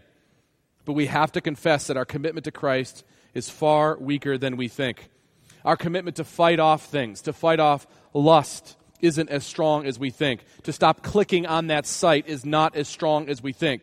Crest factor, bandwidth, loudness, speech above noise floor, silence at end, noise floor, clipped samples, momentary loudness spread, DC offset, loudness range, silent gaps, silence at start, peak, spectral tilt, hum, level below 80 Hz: 22 dB; 15 kHz; -23 LUFS; 43 dB; 0.05 s; -66 dBFS; under 0.1%; 11 LU; under 0.1%; 4 LU; none; 0.85 s; -2 dBFS; -5 dB/octave; none; -58 dBFS